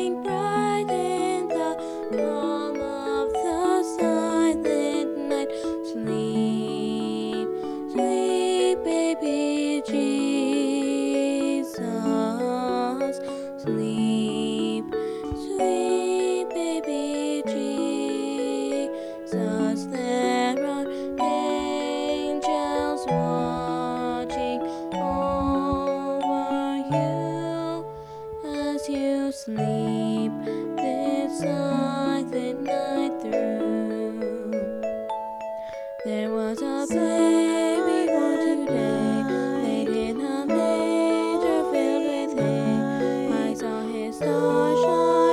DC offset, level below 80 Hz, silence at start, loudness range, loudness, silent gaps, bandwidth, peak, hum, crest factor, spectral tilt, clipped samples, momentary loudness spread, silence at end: under 0.1%; -54 dBFS; 0 s; 4 LU; -25 LUFS; none; 13.5 kHz; -10 dBFS; none; 14 dB; -5.5 dB/octave; under 0.1%; 7 LU; 0 s